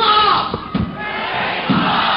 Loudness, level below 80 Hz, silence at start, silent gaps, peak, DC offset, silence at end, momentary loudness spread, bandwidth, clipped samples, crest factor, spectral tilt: -17 LUFS; -40 dBFS; 0 s; none; -4 dBFS; under 0.1%; 0 s; 10 LU; 5.6 kHz; under 0.1%; 14 dB; -8 dB/octave